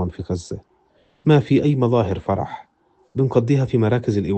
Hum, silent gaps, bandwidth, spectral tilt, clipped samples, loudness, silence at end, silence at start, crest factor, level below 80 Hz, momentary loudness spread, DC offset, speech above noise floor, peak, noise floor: none; none; 8.6 kHz; -8.5 dB/octave; under 0.1%; -20 LUFS; 0 s; 0 s; 16 dB; -48 dBFS; 14 LU; under 0.1%; 41 dB; -2 dBFS; -60 dBFS